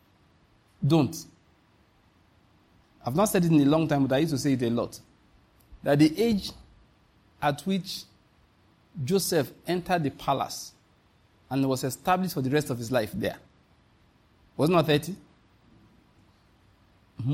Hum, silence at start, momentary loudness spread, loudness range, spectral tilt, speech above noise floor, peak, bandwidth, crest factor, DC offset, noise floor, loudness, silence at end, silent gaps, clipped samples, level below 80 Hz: none; 0.8 s; 16 LU; 5 LU; -6 dB/octave; 37 dB; -10 dBFS; 16.5 kHz; 20 dB; under 0.1%; -63 dBFS; -26 LUFS; 0 s; none; under 0.1%; -58 dBFS